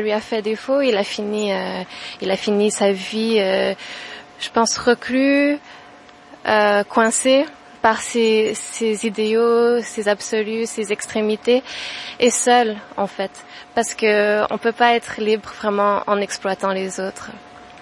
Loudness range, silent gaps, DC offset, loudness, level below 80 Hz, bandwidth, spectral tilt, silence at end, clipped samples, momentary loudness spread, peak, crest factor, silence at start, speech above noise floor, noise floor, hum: 3 LU; none; under 0.1%; -19 LUFS; -60 dBFS; 11.5 kHz; -3 dB/octave; 0.05 s; under 0.1%; 12 LU; 0 dBFS; 18 dB; 0 s; 25 dB; -44 dBFS; none